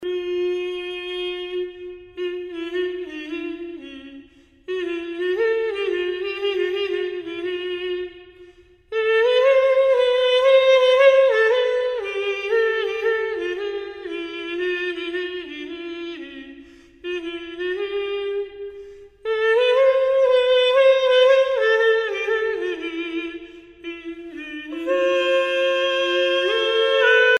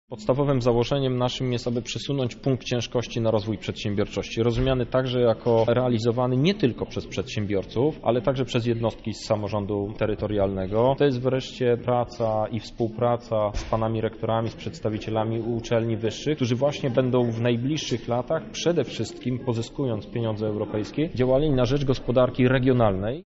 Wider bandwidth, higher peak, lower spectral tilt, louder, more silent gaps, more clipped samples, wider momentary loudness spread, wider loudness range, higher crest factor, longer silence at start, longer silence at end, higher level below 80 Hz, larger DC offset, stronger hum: about the same, 8.6 kHz vs 8 kHz; first, -4 dBFS vs -8 dBFS; second, -2.5 dB/octave vs -6 dB/octave; first, -20 LUFS vs -25 LUFS; neither; neither; first, 18 LU vs 7 LU; first, 12 LU vs 3 LU; about the same, 16 dB vs 16 dB; about the same, 0 s vs 0.1 s; about the same, 0 s vs 0.05 s; second, -60 dBFS vs -42 dBFS; neither; neither